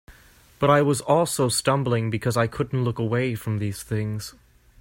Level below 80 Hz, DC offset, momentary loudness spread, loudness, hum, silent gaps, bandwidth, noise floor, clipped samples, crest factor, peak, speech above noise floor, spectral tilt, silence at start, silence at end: -52 dBFS; under 0.1%; 8 LU; -23 LUFS; none; none; 16.5 kHz; -52 dBFS; under 0.1%; 18 dB; -6 dBFS; 30 dB; -5.5 dB/octave; 0.1 s; 0.5 s